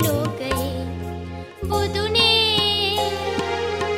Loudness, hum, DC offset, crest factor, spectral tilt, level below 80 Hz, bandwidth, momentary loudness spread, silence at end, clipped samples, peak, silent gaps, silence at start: -20 LUFS; none; under 0.1%; 18 dB; -4 dB/octave; -40 dBFS; 16 kHz; 16 LU; 0 s; under 0.1%; -4 dBFS; none; 0 s